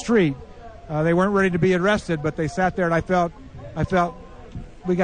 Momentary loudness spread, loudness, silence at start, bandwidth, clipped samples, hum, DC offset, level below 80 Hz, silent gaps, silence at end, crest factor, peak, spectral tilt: 20 LU; -22 LUFS; 0 s; 9.6 kHz; under 0.1%; none; under 0.1%; -42 dBFS; none; 0 s; 14 dB; -8 dBFS; -7 dB/octave